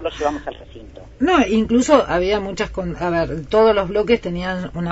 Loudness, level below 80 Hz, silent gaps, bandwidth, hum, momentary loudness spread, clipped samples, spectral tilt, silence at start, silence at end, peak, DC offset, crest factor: -18 LUFS; -38 dBFS; none; 8 kHz; none; 10 LU; under 0.1%; -5.5 dB/octave; 0 s; 0 s; 0 dBFS; under 0.1%; 18 dB